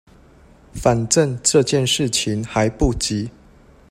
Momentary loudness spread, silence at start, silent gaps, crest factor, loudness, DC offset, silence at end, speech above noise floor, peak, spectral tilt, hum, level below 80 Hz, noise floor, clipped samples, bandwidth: 8 LU; 0.75 s; none; 20 dB; -18 LUFS; under 0.1%; 0.6 s; 30 dB; 0 dBFS; -4 dB/octave; none; -36 dBFS; -48 dBFS; under 0.1%; 16 kHz